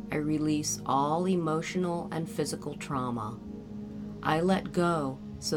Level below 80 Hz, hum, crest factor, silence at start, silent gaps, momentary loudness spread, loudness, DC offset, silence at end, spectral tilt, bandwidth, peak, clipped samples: -56 dBFS; none; 18 dB; 0 s; none; 13 LU; -30 LUFS; under 0.1%; 0 s; -5.5 dB/octave; 18 kHz; -12 dBFS; under 0.1%